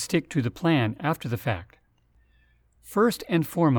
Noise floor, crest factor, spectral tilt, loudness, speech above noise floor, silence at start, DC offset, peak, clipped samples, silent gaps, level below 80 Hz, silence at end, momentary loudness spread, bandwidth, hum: -63 dBFS; 16 dB; -6 dB/octave; -26 LUFS; 39 dB; 0 s; under 0.1%; -10 dBFS; under 0.1%; none; -58 dBFS; 0 s; 7 LU; over 20 kHz; none